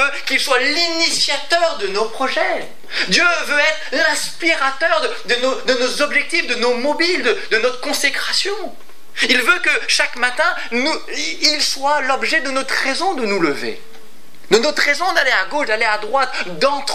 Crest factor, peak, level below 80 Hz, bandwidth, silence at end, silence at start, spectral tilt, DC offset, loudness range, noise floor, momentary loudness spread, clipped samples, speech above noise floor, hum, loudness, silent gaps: 18 dB; 0 dBFS; -68 dBFS; 16 kHz; 0 s; 0 s; -1.5 dB/octave; 5%; 2 LU; -46 dBFS; 6 LU; under 0.1%; 28 dB; none; -16 LUFS; none